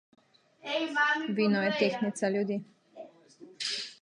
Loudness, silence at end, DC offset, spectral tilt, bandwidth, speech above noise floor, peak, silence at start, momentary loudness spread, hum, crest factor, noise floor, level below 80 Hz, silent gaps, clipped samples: -30 LUFS; 0.1 s; under 0.1%; -4.5 dB/octave; 10.5 kHz; 26 dB; -12 dBFS; 0.65 s; 19 LU; none; 18 dB; -54 dBFS; -82 dBFS; none; under 0.1%